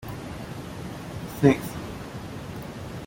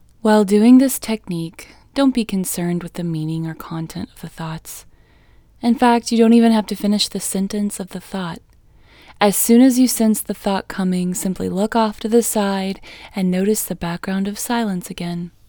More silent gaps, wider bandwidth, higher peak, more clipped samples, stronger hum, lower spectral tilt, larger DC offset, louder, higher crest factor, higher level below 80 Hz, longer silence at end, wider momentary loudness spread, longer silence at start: neither; second, 17 kHz vs over 20 kHz; second, -4 dBFS vs 0 dBFS; neither; neither; first, -6.5 dB/octave vs -5 dB/octave; neither; second, -29 LUFS vs -18 LUFS; first, 24 dB vs 18 dB; about the same, -48 dBFS vs -48 dBFS; second, 0 s vs 0.2 s; about the same, 16 LU vs 17 LU; second, 0 s vs 0.25 s